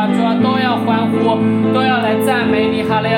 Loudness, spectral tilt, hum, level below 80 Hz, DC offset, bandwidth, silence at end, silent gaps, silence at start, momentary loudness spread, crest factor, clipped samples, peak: -14 LUFS; -6.5 dB/octave; none; -56 dBFS; under 0.1%; 16.5 kHz; 0 s; none; 0 s; 1 LU; 10 dB; under 0.1%; -4 dBFS